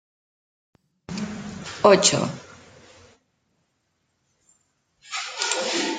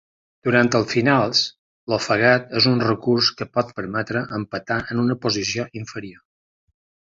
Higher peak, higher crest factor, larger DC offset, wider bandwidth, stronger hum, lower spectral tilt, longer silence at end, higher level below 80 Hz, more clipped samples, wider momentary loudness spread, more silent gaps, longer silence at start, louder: about the same, -2 dBFS vs -2 dBFS; about the same, 24 dB vs 20 dB; neither; first, 9.6 kHz vs 7.8 kHz; neither; second, -3 dB/octave vs -4.5 dB/octave; second, 0 s vs 1 s; second, -62 dBFS vs -56 dBFS; neither; first, 19 LU vs 11 LU; second, none vs 1.59-1.87 s; first, 1.1 s vs 0.45 s; about the same, -22 LUFS vs -20 LUFS